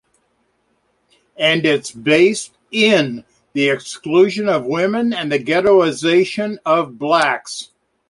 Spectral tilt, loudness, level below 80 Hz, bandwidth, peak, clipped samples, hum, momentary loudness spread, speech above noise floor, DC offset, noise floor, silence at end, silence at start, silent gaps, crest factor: -4.5 dB/octave; -16 LUFS; -60 dBFS; 11.5 kHz; -2 dBFS; under 0.1%; none; 11 LU; 48 dB; under 0.1%; -64 dBFS; 0.45 s; 1.4 s; none; 16 dB